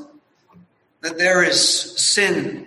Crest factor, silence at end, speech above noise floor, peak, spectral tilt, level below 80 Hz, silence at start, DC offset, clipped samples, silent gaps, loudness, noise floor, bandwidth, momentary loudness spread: 18 dB; 0 s; 35 dB; -2 dBFS; -1.5 dB/octave; -66 dBFS; 0 s; under 0.1%; under 0.1%; none; -16 LUFS; -53 dBFS; 12.5 kHz; 10 LU